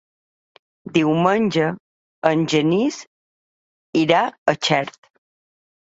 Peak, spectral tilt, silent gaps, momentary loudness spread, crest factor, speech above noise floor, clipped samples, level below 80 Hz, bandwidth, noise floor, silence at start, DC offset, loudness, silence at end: -2 dBFS; -5.5 dB/octave; 1.80-2.22 s, 3.07-3.93 s, 4.38-4.46 s; 7 LU; 20 dB; over 71 dB; under 0.1%; -62 dBFS; 8 kHz; under -90 dBFS; 0.85 s; under 0.1%; -19 LUFS; 1.05 s